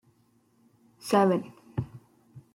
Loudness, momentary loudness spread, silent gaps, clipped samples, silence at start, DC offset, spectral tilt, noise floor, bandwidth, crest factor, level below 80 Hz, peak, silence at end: -27 LUFS; 19 LU; none; under 0.1%; 1.05 s; under 0.1%; -6.5 dB/octave; -66 dBFS; 16 kHz; 22 dB; -64 dBFS; -10 dBFS; 0.15 s